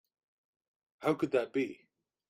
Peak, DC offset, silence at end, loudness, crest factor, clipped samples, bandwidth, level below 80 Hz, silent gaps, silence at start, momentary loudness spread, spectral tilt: -16 dBFS; under 0.1%; 0.55 s; -34 LUFS; 20 dB; under 0.1%; 15 kHz; -78 dBFS; none; 1 s; 6 LU; -6.5 dB/octave